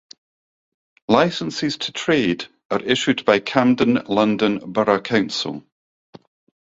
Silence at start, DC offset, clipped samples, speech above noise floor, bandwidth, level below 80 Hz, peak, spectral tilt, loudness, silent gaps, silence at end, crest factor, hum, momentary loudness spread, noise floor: 1.1 s; under 0.1%; under 0.1%; over 71 dB; 7.8 kHz; -58 dBFS; 0 dBFS; -5 dB/octave; -19 LUFS; 2.65-2.70 s; 1.1 s; 20 dB; none; 9 LU; under -90 dBFS